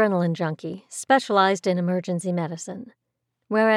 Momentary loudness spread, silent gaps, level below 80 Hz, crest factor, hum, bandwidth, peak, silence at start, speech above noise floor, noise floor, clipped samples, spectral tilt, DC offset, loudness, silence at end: 15 LU; none; -80 dBFS; 18 dB; none; 12.5 kHz; -4 dBFS; 0 s; 56 dB; -79 dBFS; under 0.1%; -5.5 dB/octave; under 0.1%; -23 LUFS; 0 s